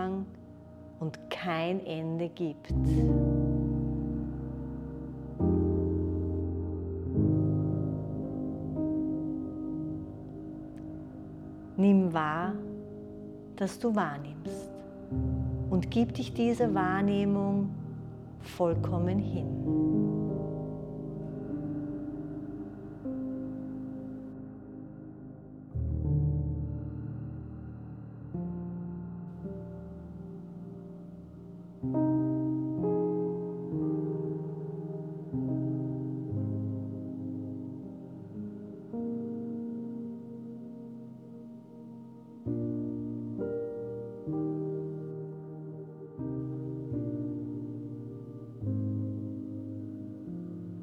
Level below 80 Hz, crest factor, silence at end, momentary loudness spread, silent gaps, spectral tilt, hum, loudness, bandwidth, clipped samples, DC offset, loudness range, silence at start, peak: -46 dBFS; 18 dB; 0 s; 16 LU; none; -9 dB/octave; none; -33 LUFS; 12 kHz; under 0.1%; under 0.1%; 10 LU; 0 s; -14 dBFS